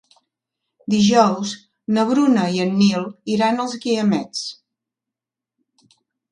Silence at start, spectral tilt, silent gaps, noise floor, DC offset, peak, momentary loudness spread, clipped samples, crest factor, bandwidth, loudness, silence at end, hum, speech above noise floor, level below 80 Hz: 0.9 s; -5.5 dB/octave; none; -87 dBFS; under 0.1%; -2 dBFS; 13 LU; under 0.1%; 18 dB; 10.5 kHz; -19 LUFS; 1.8 s; none; 69 dB; -64 dBFS